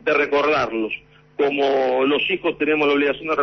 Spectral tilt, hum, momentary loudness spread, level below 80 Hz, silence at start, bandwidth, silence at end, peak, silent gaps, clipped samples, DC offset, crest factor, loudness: -5.5 dB/octave; none; 8 LU; -56 dBFS; 0.05 s; 6.4 kHz; 0 s; -8 dBFS; none; under 0.1%; under 0.1%; 12 dB; -19 LUFS